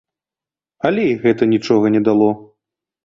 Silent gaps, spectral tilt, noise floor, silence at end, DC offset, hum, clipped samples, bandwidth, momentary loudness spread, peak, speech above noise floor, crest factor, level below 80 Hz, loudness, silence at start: none; -7.5 dB/octave; -90 dBFS; 0.6 s; under 0.1%; none; under 0.1%; 7.4 kHz; 6 LU; -2 dBFS; 75 dB; 16 dB; -56 dBFS; -16 LUFS; 0.85 s